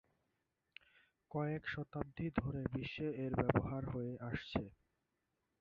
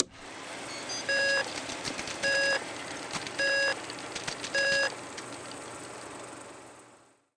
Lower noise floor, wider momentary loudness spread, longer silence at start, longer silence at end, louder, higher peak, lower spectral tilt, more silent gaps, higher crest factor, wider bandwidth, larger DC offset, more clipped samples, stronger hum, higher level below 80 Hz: first, -86 dBFS vs -59 dBFS; about the same, 18 LU vs 17 LU; first, 1.3 s vs 0 s; first, 0.9 s vs 0.4 s; second, -41 LUFS vs -30 LUFS; second, -16 dBFS vs -4 dBFS; first, -6.5 dB/octave vs -1.5 dB/octave; neither; about the same, 26 dB vs 28 dB; second, 6.8 kHz vs 10.5 kHz; neither; neither; neither; first, -58 dBFS vs -66 dBFS